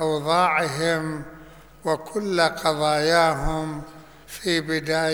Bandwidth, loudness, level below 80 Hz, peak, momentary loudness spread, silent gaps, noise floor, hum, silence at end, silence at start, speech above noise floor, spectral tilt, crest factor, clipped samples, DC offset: over 20 kHz; -23 LUFS; -42 dBFS; -4 dBFS; 15 LU; none; -46 dBFS; none; 0 s; 0 s; 24 dB; -4.5 dB/octave; 18 dB; under 0.1%; 0.2%